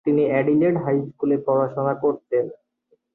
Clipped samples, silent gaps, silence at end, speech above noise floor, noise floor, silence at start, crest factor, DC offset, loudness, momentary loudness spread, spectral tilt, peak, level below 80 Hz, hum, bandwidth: under 0.1%; none; 0.6 s; 45 dB; -65 dBFS; 0.05 s; 14 dB; under 0.1%; -22 LUFS; 6 LU; -11.5 dB/octave; -8 dBFS; -64 dBFS; none; 4 kHz